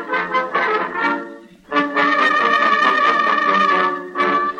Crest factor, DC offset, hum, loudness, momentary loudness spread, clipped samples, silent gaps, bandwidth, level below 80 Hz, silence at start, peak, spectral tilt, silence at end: 16 dB; under 0.1%; none; -16 LUFS; 6 LU; under 0.1%; none; 9.4 kHz; -62 dBFS; 0 s; -2 dBFS; -4 dB/octave; 0 s